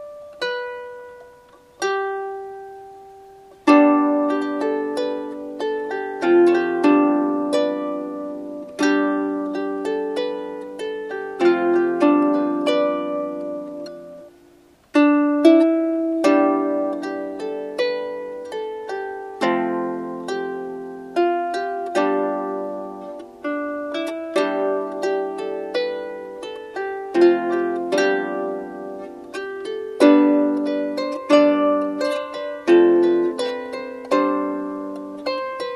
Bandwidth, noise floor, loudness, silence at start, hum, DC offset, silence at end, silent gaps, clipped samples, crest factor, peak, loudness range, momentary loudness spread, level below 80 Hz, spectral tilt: 11.5 kHz; -52 dBFS; -21 LUFS; 0 s; none; under 0.1%; 0 s; none; under 0.1%; 20 dB; -2 dBFS; 7 LU; 16 LU; -66 dBFS; -5 dB/octave